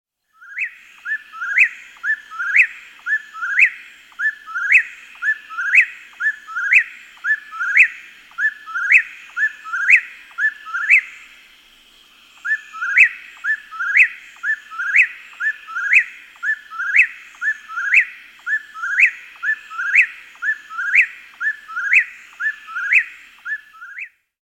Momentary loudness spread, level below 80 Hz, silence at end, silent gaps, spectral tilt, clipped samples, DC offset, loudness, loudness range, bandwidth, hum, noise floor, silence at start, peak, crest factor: 15 LU; -70 dBFS; 0.4 s; none; 3 dB/octave; under 0.1%; under 0.1%; -17 LUFS; 2 LU; 16.5 kHz; none; -49 dBFS; 0.5 s; 0 dBFS; 20 dB